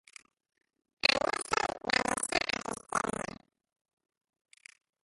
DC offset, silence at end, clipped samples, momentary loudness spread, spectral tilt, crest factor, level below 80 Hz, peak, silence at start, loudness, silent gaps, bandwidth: under 0.1%; 1.8 s; under 0.1%; 9 LU; -1.5 dB/octave; 28 dB; -62 dBFS; -8 dBFS; 1.05 s; -31 LUFS; none; 12 kHz